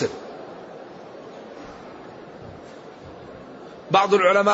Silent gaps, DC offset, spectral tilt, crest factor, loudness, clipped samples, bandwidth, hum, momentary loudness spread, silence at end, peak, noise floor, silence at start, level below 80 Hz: none; under 0.1%; -4.5 dB/octave; 20 dB; -19 LUFS; under 0.1%; 8 kHz; none; 24 LU; 0 s; -4 dBFS; -41 dBFS; 0 s; -62 dBFS